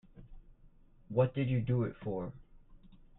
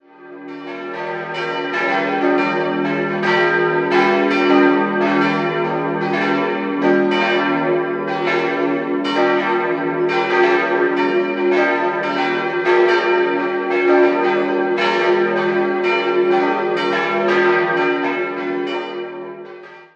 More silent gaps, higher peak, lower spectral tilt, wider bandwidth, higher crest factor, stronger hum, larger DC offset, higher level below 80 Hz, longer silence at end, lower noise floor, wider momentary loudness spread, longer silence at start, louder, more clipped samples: neither; second, -16 dBFS vs -2 dBFS; first, -11.5 dB/octave vs -6 dB/octave; second, 4 kHz vs 7.6 kHz; about the same, 20 dB vs 16 dB; neither; neither; first, -56 dBFS vs -68 dBFS; first, 0.25 s vs 0.1 s; first, -60 dBFS vs -37 dBFS; about the same, 9 LU vs 9 LU; about the same, 0.15 s vs 0.2 s; second, -34 LUFS vs -17 LUFS; neither